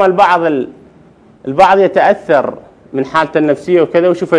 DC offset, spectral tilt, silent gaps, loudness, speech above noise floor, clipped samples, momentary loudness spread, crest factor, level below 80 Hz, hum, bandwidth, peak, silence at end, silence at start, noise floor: under 0.1%; -6.5 dB/octave; none; -11 LUFS; 32 dB; 0.6%; 13 LU; 12 dB; -52 dBFS; none; 10.5 kHz; 0 dBFS; 0 s; 0 s; -43 dBFS